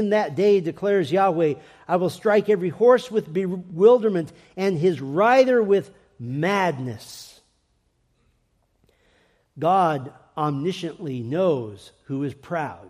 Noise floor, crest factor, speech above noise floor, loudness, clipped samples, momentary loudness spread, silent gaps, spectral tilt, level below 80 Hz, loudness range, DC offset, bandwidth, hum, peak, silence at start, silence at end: -67 dBFS; 18 dB; 46 dB; -22 LUFS; under 0.1%; 15 LU; none; -7 dB/octave; -66 dBFS; 10 LU; under 0.1%; 14.5 kHz; none; -4 dBFS; 0 s; 0 s